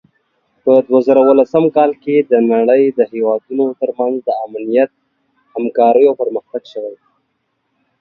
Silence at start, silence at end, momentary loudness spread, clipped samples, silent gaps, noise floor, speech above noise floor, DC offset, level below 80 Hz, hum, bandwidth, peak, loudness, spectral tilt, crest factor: 0.65 s; 1.05 s; 13 LU; under 0.1%; none; -68 dBFS; 55 dB; under 0.1%; -64 dBFS; none; 5.4 kHz; 0 dBFS; -13 LUFS; -9 dB/octave; 14 dB